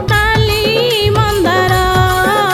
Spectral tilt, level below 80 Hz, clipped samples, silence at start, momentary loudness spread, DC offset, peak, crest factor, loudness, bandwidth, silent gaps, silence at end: -4.5 dB/octave; -24 dBFS; under 0.1%; 0 s; 1 LU; under 0.1%; 0 dBFS; 12 dB; -12 LUFS; 18 kHz; none; 0 s